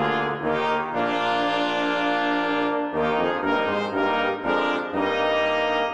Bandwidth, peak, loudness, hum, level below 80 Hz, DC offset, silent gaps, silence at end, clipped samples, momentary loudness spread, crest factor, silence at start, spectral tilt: 9.4 kHz; -12 dBFS; -23 LUFS; none; -62 dBFS; 0.2%; none; 0 s; under 0.1%; 3 LU; 12 dB; 0 s; -5.5 dB/octave